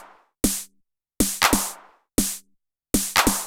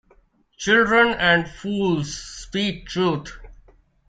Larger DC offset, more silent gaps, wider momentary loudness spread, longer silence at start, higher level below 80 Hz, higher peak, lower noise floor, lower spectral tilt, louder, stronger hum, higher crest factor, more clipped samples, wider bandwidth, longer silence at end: neither; neither; about the same, 14 LU vs 14 LU; second, 0 s vs 0.6 s; first, -38 dBFS vs -46 dBFS; about the same, -4 dBFS vs -4 dBFS; first, -68 dBFS vs -58 dBFS; second, -2 dB/octave vs -4.5 dB/octave; about the same, -22 LUFS vs -20 LUFS; neither; about the same, 22 dB vs 18 dB; neither; first, 18 kHz vs 9.4 kHz; second, 0 s vs 0.55 s